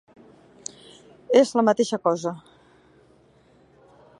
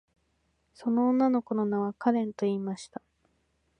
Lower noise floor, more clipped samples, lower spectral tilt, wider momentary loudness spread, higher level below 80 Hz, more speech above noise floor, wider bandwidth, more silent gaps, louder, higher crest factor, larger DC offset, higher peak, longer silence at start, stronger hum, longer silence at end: second, -57 dBFS vs -73 dBFS; neither; second, -4.5 dB/octave vs -7.5 dB/octave; first, 20 LU vs 14 LU; about the same, -72 dBFS vs -76 dBFS; second, 37 dB vs 46 dB; first, 11.5 kHz vs 9.8 kHz; neither; first, -21 LUFS vs -28 LUFS; about the same, 22 dB vs 18 dB; neither; first, -4 dBFS vs -12 dBFS; first, 1.3 s vs 0.8 s; neither; first, 1.8 s vs 0.95 s